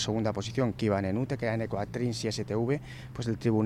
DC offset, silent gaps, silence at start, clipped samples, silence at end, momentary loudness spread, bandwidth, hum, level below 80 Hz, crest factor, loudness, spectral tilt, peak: under 0.1%; none; 0 s; under 0.1%; 0 s; 5 LU; 12.5 kHz; none; -54 dBFS; 14 dB; -31 LUFS; -6 dB/octave; -16 dBFS